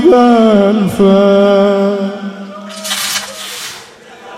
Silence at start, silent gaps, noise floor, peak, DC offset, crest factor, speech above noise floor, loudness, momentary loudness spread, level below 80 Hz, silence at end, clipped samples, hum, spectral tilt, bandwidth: 0 s; none; -35 dBFS; 0 dBFS; under 0.1%; 12 dB; 27 dB; -10 LUFS; 18 LU; -48 dBFS; 0 s; 0.6%; none; -5 dB/octave; 16 kHz